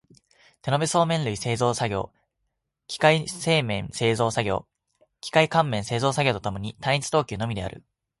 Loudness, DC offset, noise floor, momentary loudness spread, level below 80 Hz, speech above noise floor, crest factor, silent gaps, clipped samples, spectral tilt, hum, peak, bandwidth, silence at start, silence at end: -24 LUFS; under 0.1%; -78 dBFS; 11 LU; -52 dBFS; 54 dB; 22 dB; none; under 0.1%; -4.5 dB/octave; none; -4 dBFS; 11.5 kHz; 0.65 s; 0.4 s